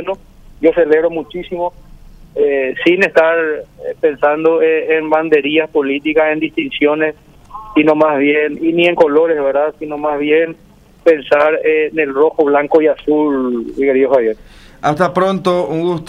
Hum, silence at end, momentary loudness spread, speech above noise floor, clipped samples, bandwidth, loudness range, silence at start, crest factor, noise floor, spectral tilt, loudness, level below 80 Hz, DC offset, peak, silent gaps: none; 0 s; 9 LU; 20 dB; under 0.1%; 9.8 kHz; 2 LU; 0 s; 14 dB; -33 dBFS; -6.5 dB/octave; -14 LUFS; -46 dBFS; under 0.1%; 0 dBFS; none